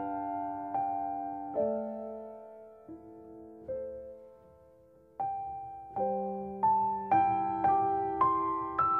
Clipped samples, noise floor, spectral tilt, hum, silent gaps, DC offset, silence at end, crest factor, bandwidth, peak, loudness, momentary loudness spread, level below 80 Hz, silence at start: under 0.1%; -60 dBFS; -9.5 dB/octave; none; none; under 0.1%; 0 s; 18 dB; 4.2 kHz; -16 dBFS; -32 LUFS; 22 LU; -64 dBFS; 0 s